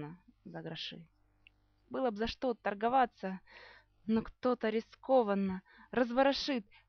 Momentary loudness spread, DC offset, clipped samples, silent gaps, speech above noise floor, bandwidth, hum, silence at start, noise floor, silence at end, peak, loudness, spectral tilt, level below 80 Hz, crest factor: 18 LU; under 0.1%; under 0.1%; none; 34 dB; 6.6 kHz; 50 Hz at -75 dBFS; 0 s; -68 dBFS; 0.25 s; -16 dBFS; -34 LUFS; -3.5 dB/octave; -62 dBFS; 20 dB